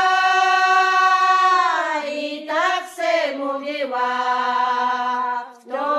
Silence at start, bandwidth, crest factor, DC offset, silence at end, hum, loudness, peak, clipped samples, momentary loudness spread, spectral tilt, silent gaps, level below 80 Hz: 0 s; 13 kHz; 14 dB; under 0.1%; 0 s; none; -19 LUFS; -4 dBFS; under 0.1%; 10 LU; 0 dB/octave; none; -86 dBFS